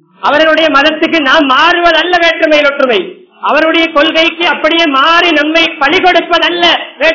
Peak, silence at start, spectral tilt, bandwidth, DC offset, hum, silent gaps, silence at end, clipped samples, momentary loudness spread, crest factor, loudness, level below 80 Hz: 0 dBFS; 0.2 s; -2.5 dB/octave; 6 kHz; 0.6%; none; none; 0 s; 3%; 4 LU; 8 dB; -7 LUFS; -44 dBFS